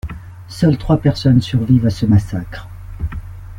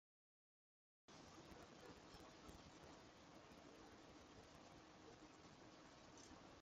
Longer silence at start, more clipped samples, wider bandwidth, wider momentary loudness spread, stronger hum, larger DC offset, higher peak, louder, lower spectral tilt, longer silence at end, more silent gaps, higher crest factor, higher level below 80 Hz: second, 0.05 s vs 1.1 s; neither; about the same, 12 kHz vs 13 kHz; first, 18 LU vs 2 LU; neither; neither; first, -2 dBFS vs -48 dBFS; first, -16 LUFS vs -64 LUFS; first, -8 dB/octave vs -4 dB/octave; about the same, 0 s vs 0 s; neither; about the same, 14 dB vs 16 dB; first, -32 dBFS vs -78 dBFS